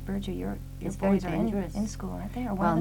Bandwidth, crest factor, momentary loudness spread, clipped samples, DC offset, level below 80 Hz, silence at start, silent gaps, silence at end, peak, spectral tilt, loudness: 18 kHz; 16 dB; 10 LU; under 0.1%; 0.1%; -42 dBFS; 0 s; none; 0 s; -14 dBFS; -7 dB/octave; -31 LUFS